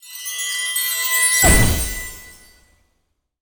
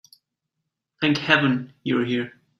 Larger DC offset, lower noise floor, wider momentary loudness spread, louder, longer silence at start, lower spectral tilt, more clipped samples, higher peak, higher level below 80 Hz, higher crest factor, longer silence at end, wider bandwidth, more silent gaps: neither; second, -69 dBFS vs -81 dBFS; first, 16 LU vs 8 LU; first, -16 LUFS vs -22 LUFS; second, 0.05 s vs 1 s; second, -2 dB/octave vs -6 dB/octave; neither; about the same, -2 dBFS vs -2 dBFS; first, -28 dBFS vs -64 dBFS; about the same, 20 dB vs 22 dB; first, 1.1 s vs 0.3 s; first, over 20 kHz vs 12 kHz; neither